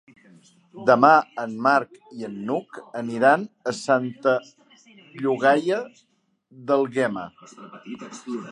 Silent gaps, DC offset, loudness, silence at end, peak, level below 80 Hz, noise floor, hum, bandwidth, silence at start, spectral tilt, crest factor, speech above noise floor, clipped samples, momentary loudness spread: none; under 0.1%; -22 LUFS; 0 s; -2 dBFS; -74 dBFS; -54 dBFS; none; 11 kHz; 0.75 s; -5.5 dB/octave; 22 dB; 31 dB; under 0.1%; 21 LU